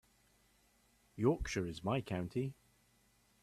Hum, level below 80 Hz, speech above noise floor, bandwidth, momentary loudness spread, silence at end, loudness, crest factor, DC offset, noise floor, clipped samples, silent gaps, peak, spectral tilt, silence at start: none; -56 dBFS; 35 dB; 14 kHz; 8 LU; 0.9 s; -38 LUFS; 22 dB; under 0.1%; -72 dBFS; under 0.1%; none; -20 dBFS; -6.5 dB/octave; 1.15 s